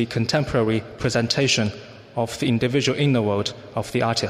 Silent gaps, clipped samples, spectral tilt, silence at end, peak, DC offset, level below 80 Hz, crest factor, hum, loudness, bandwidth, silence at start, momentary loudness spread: none; under 0.1%; -5 dB/octave; 0 s; -6 dBFS; under 0.1%; -50 dBFS; 16 dB; none; -22 LUFS; 15 kHz; 0 s; 8 LU